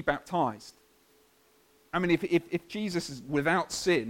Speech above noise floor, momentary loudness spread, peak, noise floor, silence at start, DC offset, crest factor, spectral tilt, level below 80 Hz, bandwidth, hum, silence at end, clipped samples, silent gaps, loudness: 35 dB; 8 LU; -12 dBFS; -64 dBFS; 0 s; under 0.1%; 20 dB; -5 dB/octave; -60 dBFS; 16.5 kHz; none; 0 s; under 0.1%; none; -30 LUFS